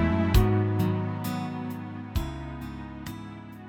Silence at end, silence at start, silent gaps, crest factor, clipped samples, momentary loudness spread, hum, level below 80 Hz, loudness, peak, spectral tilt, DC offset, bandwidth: 0 s; 0 s; none; 20 dB; under 0.1%; 16 LU; none; -34 dBFS; -29 LUFS; -8 dBFS; -7 dB/octave; under 0.1%; 18.5 kHz